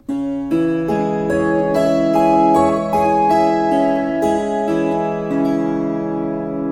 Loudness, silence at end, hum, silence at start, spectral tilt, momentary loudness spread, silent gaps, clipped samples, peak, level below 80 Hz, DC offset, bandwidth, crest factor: -17 LUFS; 0 s; none; 0.1 s; -7 dB/octave; 7 LU; none; under 0.1%; -2 dBFS; -44 dBFS; under 0.1%; 15.5 kHz; 14 dB